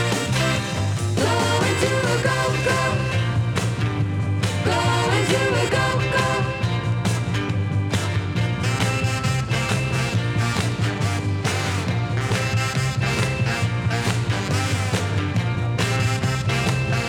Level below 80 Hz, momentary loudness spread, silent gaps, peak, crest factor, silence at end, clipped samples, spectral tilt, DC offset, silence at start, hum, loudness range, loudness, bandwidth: -42 dBFS; 4 LU; none; -6 dBFS; 16 dB; 0 s; under 0.1%; -5 dB/octave; under 0.1%; 0 s; none; 2 LU; -22 LUFS; 16 kHz